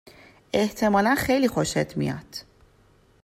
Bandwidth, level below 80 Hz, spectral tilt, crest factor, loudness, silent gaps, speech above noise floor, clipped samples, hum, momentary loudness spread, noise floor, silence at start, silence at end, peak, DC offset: 16 kHz; -50 dBFS; -5 dB/octave; 16 dB; -23 LUFS; none; 35 dB; under 0.1%; none; 14 LU; -58 dBFS; 0.55 s; 0.8 s; -8 dBFS; under 0.1%